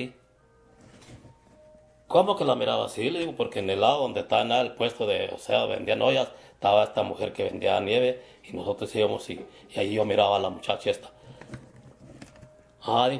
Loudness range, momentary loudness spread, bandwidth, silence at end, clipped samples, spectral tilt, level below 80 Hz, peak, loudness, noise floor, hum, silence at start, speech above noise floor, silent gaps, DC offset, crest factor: 4 LU; 15 LU; 11 kHz; 0 s; under 0.1%; -5 dB/octave; -64 dBFS; -6 dBFS; -26 LUFS; -60 dBFS; none; 0 s; 34 dB; none; under 0.1%; 22 dB